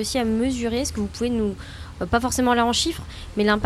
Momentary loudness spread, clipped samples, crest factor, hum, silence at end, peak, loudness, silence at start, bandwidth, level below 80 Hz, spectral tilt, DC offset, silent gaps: 13 LU; under 0.1%; 18 dB; none; 0 s; -6 dBFS; -23 LUFS; 0 s; 15 kHz; -38 dBFS; -4 dB/octave; under 0.1%; none